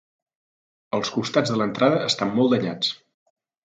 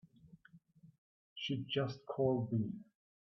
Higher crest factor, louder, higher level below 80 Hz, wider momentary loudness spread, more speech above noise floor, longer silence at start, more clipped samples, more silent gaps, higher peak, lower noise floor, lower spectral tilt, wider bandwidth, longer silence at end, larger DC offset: about the same, 20 dB vs 20 dB; first, -22 LUFS vs -38 LUFS; first, -66 dBFS vs -74 dBFS; second, 7 LU vs 12 LU; first, over 68 dB vs 27 dB; first, 0.95 s vs 0.25 s; neither; second, none vs 0.98-1.36 s; first, -4 dBFS vs -22 dBFS; first, under -90 dBFS vs -64 dBFS; about the same, -5 dB/octave vs -5.5 dB/octave; first, 9.2 kHz vs 6.2 kHz; first, 0.7 s vs 0.45 s; neither